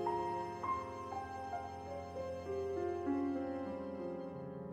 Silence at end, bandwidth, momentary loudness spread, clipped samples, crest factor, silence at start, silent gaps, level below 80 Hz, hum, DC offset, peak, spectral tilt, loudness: 0 s; 13.5 kHz; 8 LU; under 0.1%; 16 dB; 0 s; none; -70 dBFS; none; under 0.1%; -26 dBFS; -7 dB/octave; -41 LUFS